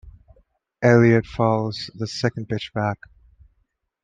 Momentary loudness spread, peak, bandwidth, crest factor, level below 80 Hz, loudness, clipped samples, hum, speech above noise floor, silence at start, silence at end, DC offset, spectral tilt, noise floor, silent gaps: 13 LU; -2 dBFS; 7.8 kHz; 20 dB; -52 dBFS; -21 LUFS; under 0.1%; none; 50 dB; 0.05 s; 1.1 s; under 0.1%; -7 dB/octave; -70 dBFS; none